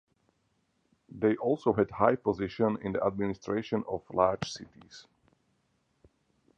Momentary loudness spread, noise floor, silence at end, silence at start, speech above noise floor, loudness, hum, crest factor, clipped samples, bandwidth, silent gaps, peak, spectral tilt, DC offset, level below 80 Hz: 9 LU; -75 dBFS; 1.55 s; 1.15 s; 45 dB; -30 LUFS; none; 24 dB; under 0.1%; 9 kHz; none; -8 dBFS; -6.5 dB/octave; under 0.1%; -60 dBFS